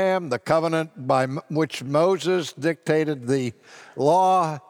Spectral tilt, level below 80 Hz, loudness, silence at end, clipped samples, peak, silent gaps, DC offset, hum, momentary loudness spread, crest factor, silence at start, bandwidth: -6 dB/octave; -68 dBFS; -23 LUFS; 0.1 s; under 0.1%; -6 dBFS; none; under 0.1%; none; 7 LU; 16 dB; 0 s; 17 kHz